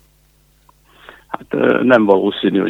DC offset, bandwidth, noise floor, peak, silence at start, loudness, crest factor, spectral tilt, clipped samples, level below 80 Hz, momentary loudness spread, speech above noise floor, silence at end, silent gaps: under 0.1%; 7.8 kHz; -54 dBFS; 0 dBFS; 1.3 s; -14 LUFS; 16 dB; -7.5 dB/octave; under 0.1%; -56 dBFS; 18 LU; 40 dB; 0 s; none